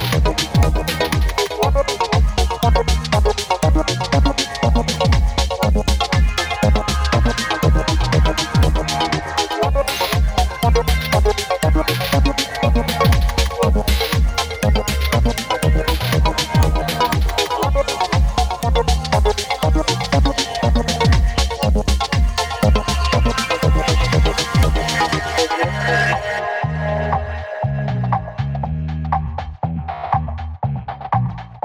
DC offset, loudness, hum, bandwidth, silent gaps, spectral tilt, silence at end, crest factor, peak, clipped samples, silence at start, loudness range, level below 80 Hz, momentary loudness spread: 0.3%; -18 LUFS; none; over 20 kHz; none; -5 dB/octave; 0.05 s; 14 dB; -2 dBFS; under 0.1%; 0 s; 3 LU; -20 dBFS; 5 LU